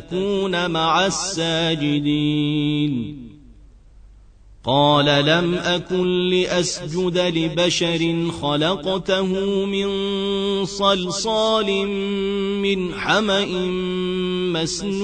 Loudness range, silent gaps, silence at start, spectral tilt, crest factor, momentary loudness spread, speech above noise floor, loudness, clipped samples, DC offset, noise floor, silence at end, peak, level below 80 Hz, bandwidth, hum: 3 LU; none; 0 s; -4.5 dB/octave; 16 dB; 5 LU; 26 dB; -20 LUFS; under 0.1%; under 0.1%; -46 dBFS; 0 s; -4 dBFS; -46 dBFS; 9.6 kHz; none